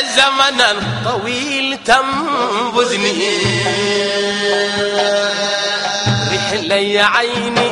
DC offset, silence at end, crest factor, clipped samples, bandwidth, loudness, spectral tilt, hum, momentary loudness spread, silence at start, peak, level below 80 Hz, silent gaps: under 0.1%; 0 s; 16 dB; under 0.1%; 11.5 kHz; -14 LUFS; -3 dB/octave; none; 5 LU; 0 s; 0 dBFS; -48 dBFS; none